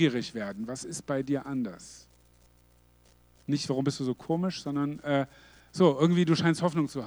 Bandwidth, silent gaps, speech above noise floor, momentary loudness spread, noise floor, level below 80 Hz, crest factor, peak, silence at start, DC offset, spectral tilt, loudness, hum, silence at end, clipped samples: 19 kHz; none; 33 dB; 13 LU; -61 dBFS; -64 dBFS; 20 dB; -10 dBFS; 0 s; under 0.1%; -6 dB/octave; -29 LUFS; 60 Hz at -55 dBFS; 0 s; under 0.1%